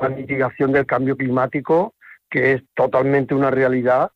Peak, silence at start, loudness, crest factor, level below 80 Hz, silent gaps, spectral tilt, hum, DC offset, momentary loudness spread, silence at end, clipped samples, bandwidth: -4 dBFS; 0 s; -19 LUFS; 14 dB; -56 dBFS; none; -9 dB/octave; none; under 0.1%; 5 LU; 0.05 s; under 0.1%; 6 kHz